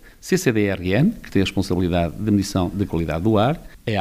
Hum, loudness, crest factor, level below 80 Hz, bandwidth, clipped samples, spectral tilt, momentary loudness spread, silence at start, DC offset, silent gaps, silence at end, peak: none; -21 LUFS; 16 dB; -40 dBFS; 15.5 kHz; under 0.1%; -6 dB/octave; 5 LU; 0.05 s; under 0.1%; none; 0 s; -4 dBFS